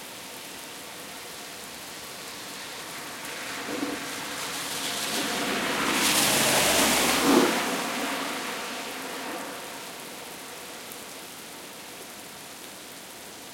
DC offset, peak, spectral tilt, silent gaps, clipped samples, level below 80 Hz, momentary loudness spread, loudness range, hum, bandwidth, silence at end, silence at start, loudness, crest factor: under 0.1%; -6 dBFS; -1.5 dB/octave; none; under 0.1%; -60 dBFS; 19 LU; 16 LU; none; 17 kHz; 0 s; 0 s; -26 LUFS; 24 dB